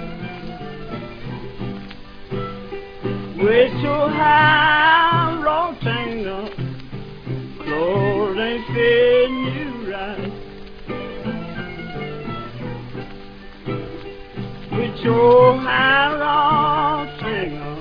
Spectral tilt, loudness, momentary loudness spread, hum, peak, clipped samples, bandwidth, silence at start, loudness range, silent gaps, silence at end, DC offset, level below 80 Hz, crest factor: -8 dB/octave; -18 LUFS; 20 LU; none; -2 dBFS; under 0.1%; 5.2 kHz; 0 s; 14 LU; none; 0 s; under 0.1%; -40 dBFS; 18 dB